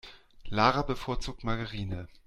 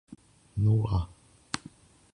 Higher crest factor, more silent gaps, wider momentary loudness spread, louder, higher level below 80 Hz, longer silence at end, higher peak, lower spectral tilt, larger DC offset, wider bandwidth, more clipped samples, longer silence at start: about the same, 22 dB vs 20 dB; neither; about the same, 12 LU vs 14 LU; about the same, -31 LUFS vs -30 LUFS; about the same, -42 dBFS vs -44 dBFS; second, 0.1 s vs 0.55 s; first, -8 dBFS vs -12 dBFS; about the same, -5.5 dB/octave vs -6.5 dB/octave; neither; first, 12.5 kHz vs 11 kHz; neither; about the same, 0.05 s vs 0.1 s